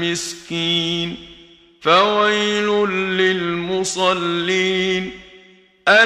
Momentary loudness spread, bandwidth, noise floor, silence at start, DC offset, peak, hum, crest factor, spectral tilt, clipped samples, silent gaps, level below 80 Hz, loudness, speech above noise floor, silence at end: 10 LU; 13.5 kHz; -49 dBFS; 0 s; under 0.1%; 0 dBFS; none; 18 dB; -3.5 dB/octave; under 0.1%; none; -54 dBFS; -18 LUFS; 30 dB; 0 s